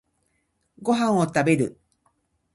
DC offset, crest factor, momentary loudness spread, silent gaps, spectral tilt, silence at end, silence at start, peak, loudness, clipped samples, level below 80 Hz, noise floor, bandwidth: under 0.1%; 20 dB; 8 LU; none; -6 dB/octave; 0.85 s; 0.8 s; -6 dBFS; -23 LUFS; under 0.1%; -64 dBFS; -72 dBFS; 11.5 kHz